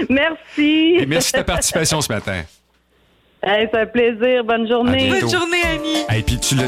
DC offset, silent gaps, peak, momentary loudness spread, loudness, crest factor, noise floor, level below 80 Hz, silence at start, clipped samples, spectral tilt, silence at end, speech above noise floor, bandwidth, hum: under 0.1%; none; -4 dBFS; 5 LU; -17 LUFS; 12 dB; -58 dBFS; -36 dBFS; 0 s; under 0.1%; -4 dB/octave; 0 s; 41 dB; 16.5 kHz; none